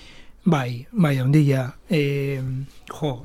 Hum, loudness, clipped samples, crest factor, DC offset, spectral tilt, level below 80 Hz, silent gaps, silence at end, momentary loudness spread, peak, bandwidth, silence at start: none; -22 LUFS; under 0.1%; 16 dB; under 0.1%; -7.5 dB/octave; -50 dBFS; none; 0 s; 11 LU; -6 dBFS; 15 kHz; 0.2 s